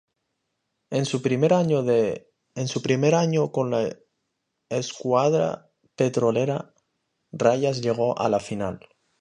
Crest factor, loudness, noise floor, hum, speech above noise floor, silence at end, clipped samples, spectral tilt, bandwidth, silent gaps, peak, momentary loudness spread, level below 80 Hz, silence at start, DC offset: 20 dB; -24 LUFS; -78 dBFS; none; 55 dB; 0.4 s; under 0.1%; -6 dB/octave; 10.5 kHz; none; -4 dBFS; 11 LU; -62 dBFS; 0.9 s; under 0.1%